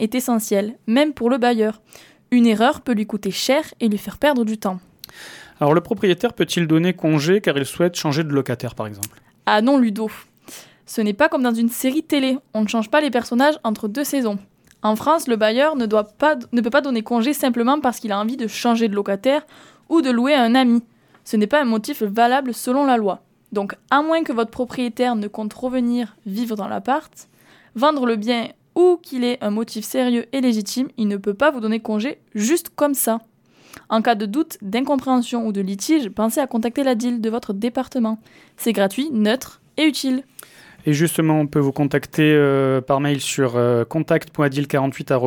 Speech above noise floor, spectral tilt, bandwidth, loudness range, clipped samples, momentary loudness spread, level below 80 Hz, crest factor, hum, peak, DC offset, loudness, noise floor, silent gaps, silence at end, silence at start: 25 dB; -5 dB/octave; 19 kHz; 3 LU; under 0.1%; 8 LU; -60 dBFS; 18 dB; none; -2 dBFS; under 0.1%; -20 LUFS; -44 dBFS; none; 0 s; 0 s